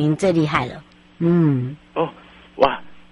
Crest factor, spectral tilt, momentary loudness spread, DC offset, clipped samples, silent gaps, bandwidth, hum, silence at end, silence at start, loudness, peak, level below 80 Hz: 20 dB; -7.5 dB/octave; 14 LU; under 0.1%; under 0.1%; none; 11.5 kHz; none; 0.15 s; 0 s; -20 LUFS; -2 dBFS; -48 dBFS